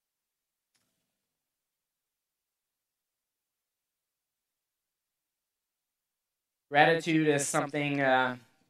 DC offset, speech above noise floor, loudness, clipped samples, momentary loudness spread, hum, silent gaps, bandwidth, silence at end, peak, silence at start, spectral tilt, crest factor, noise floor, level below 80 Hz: under 0.1%; 62 dB; -27 LUFS; under 0.1%; 6 LU; none; none; 15 kHz; 0.3 s; -6 dBFS; 6.7 s; -4 dB/octave; 28 dB; -89 dBFS; -84 dBFS